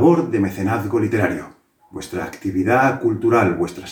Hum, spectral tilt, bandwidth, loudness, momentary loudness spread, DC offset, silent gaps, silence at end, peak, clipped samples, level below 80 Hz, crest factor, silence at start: none; -7 dB/octave; 20 kHz; -19 LUFS; 13 LU; under 0.1%; none; 0 s; -2 dBFS; under 0.1%; -56 dBFS; 18 dB; 0 s